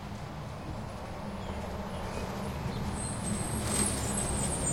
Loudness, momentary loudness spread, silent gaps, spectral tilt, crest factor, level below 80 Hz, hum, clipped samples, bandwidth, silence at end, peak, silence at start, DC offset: -34 LUFS; 11 LU; none; -4 dB/octave; 20 dB; -44 dBFS; none; under 0.1%; 16.5 kHz; 0 s; -14 dBFS; 0 s; 0.2%